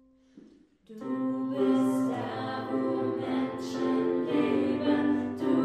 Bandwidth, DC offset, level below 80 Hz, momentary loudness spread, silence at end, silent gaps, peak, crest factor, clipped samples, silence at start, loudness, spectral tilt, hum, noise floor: 12 kHz; under 0.1%; -70 dBFS; 7 LU; 0 s; none; -14 dBFS; 14 dB; under 0.1%; 0.35 s; -29 LUFS; -6.5 dB/octave; none; -57 dBFS